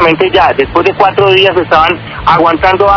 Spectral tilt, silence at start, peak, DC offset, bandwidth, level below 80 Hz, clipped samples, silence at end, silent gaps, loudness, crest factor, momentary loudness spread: -6.5 dB/octave; 0 s; 0 dBFS; under 0.1%; 5.4 kHz; -32 dBFS; 4%; 0 s; none; -8 LUFS; 8 dB; 4 LU